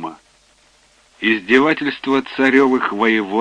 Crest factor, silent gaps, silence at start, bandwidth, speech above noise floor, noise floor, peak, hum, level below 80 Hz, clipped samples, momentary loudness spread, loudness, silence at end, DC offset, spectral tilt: 16 dB; none; 0 s; 9.6 kHz; 38 dB; -54 dBFS; -2 dBFS; none; -62 dBFS; under 0.1%; 6 LU; -16 LUFS; 0 s; under 0.1%; -5.5 dB/octave